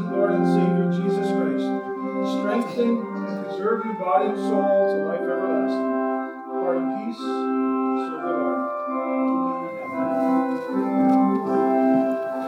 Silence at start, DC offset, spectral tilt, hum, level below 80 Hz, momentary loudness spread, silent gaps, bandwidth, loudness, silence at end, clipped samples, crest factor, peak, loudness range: 0 s; under 0.1%; -8 dB/octave; none; -80 dBFS; 8 LU; none; 9.4 kHz; -23 LUFS; 0 s; under 0.1%; 16 dB; -8 dBFS; 3 LU